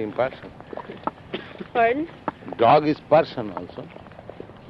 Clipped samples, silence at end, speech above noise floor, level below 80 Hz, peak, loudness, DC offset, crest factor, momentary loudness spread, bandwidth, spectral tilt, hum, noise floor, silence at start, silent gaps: under 0.1%; 0 s; 19 dB; -56 dBFS; -4 dBFS; -22 LUFS; under 0.1%; 20 dB; 23 LU; 6 kHz; -8 dB/octave; none; -41 dBFS; 0 s; none